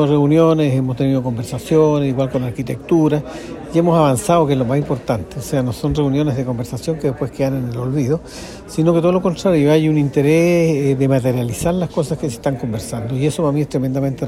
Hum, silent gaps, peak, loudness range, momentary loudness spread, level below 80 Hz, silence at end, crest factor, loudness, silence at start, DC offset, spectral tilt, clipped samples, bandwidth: none; none; 0 dBFS; 4 LU; 9 LU; -42 dBFS; 0 s; 16 dB; -17 LUFS; 0 s; under 0.1%; -7 dB/octave; under 0.1%; 15.5 kHz